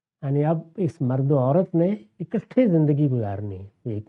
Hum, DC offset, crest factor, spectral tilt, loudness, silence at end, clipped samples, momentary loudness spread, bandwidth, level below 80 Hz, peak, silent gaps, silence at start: none; under 0.1%; 16 dB; -11 dB/octave; -23 LUFS; 0.05 s; under 0.1%; 12 LU; 3.8 kHz; -64 dBFS; -6 dBFS; none; 0.2 s